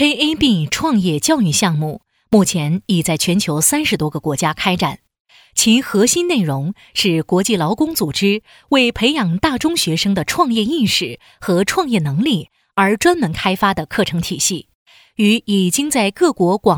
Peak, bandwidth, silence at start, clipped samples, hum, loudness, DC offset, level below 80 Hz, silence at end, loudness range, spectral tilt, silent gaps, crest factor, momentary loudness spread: -2 dBFS; 20 kHz; 0 s; under 0.1%; none; -16 LUFS; under 0.1%; -46 dBFS; 0 s; 1 LU; -4 dB/octave; 5.20-5.25 s, 14.75-14.86 s; 14 dB; 6 LU